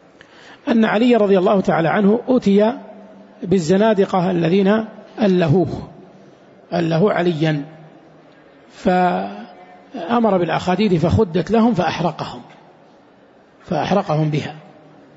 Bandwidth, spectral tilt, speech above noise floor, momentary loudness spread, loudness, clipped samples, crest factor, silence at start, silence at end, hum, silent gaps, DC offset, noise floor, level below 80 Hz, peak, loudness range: 8 kHz; -7.5 dB/octave; 33 dB; 16 LU; -17 LUFS; under 0.1%; 14 dB; 0.5 s; 0.55 s; none; none; under 0.1%; -49 dBFS; -50 dBFS; -4 dBFS; 5 LU